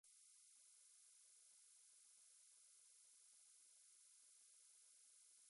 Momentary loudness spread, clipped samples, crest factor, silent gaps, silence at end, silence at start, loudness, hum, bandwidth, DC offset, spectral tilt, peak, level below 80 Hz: 0 LU; under 0.1%; 12 dB; none; 0 s; 0.05 s; -68 LUFS; none; 11.5 kHz; under 0.1%; 4 dB/octave; -58 dBFS; under -90 dBFS